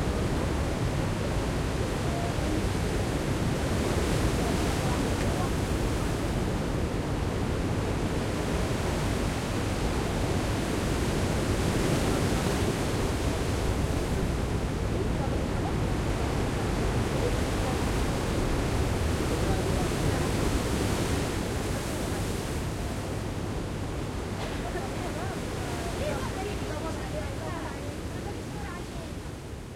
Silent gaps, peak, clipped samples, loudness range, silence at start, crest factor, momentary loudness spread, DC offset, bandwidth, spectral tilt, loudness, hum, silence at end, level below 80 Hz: none; -14 dBFS; under 0.1%; 5 LU; 0 s; 16 dB; 6 LU; 0.1%; 16.5 kHz; -5.5 dB/octave; -30 LUFS; none; 0 s; -36 dBFS